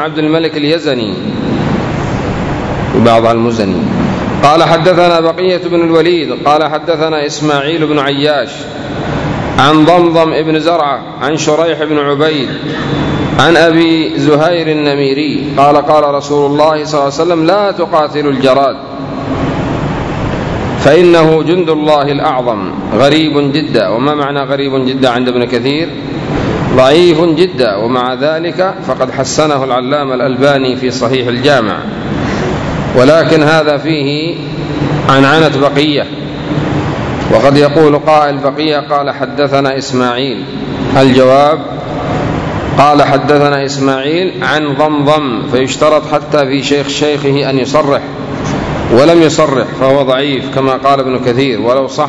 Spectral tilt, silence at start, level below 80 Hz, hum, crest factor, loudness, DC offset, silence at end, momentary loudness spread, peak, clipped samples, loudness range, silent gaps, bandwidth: -6 dB/octave; 0 s; -34 dBFS; none; 10 dB; -10 LUFS; under 0.1%; 0 s; 9 LU; 0 dBFS; 2%; 3 LU; none; 11 kHz